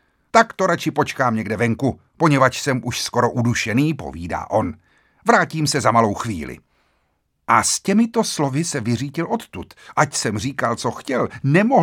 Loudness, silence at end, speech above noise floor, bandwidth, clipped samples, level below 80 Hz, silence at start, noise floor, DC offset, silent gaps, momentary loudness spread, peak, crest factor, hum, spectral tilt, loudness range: -19 LUFS; 0 s; 49 dB; 18 kHz; under 0.1%; -50 dBFS; 0.35 s; -68 dBFS; under 0.1%; none; 10 LU; 0 dBFS; 20 dB; none; -5 dB/octave; 2 LU